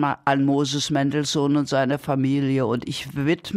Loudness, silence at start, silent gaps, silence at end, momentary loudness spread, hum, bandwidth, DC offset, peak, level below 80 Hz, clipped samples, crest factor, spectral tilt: -22 LUFS; 0 s; none; 0 s; 4 LU; none; 14.5 kHz; under 0.1%; -6 dBFS; -58 dBFS; under 0.1%; 16 dB; -5.5 dB/octave